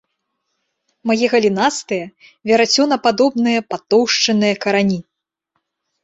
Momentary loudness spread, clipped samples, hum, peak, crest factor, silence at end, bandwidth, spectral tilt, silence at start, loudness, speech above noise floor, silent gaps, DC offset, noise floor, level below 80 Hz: 11 LU; under 0.1%; none; -2 dBFS; 16 dB; 1.05 s; 8 kHz; -4 dB/octave; 1.05 s; -16 LUFS; 57 dB; none; under 0.1%; -73 dBFS; -60 dBFS